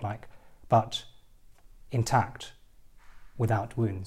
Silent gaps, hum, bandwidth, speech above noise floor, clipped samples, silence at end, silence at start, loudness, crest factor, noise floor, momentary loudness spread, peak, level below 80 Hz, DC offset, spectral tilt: none; none; 14 kHz; 26 dB; under 0.1%; 0 s; 0 s; -29 LUFS; 20 dB; -53 dBFS; 18 LU; -12 dBFS; -54 dBFS; under 0.1%; -6 dB/octave